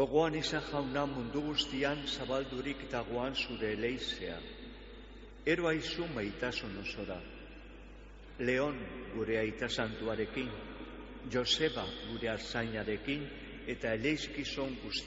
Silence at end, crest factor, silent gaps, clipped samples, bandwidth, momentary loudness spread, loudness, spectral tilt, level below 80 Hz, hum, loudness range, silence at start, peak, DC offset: 0 s; 20 dB; none; under 0.1%; 8 kHz; 17 LU; -36 LUFS; -3 dB/octave; -54 dBFS; none; 3 LU; 0 s; -16 dBFS; under 0.1%